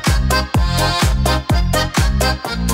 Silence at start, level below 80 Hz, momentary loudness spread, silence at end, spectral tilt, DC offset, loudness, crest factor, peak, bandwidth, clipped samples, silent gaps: 0 s; -20 dBFS; 2 LU; 0 s; -4.5 dB/octave; under 0.1%; -16 LUFS; 12 dB; -4 dBFS; 16.5 kHz; under 0.1%; none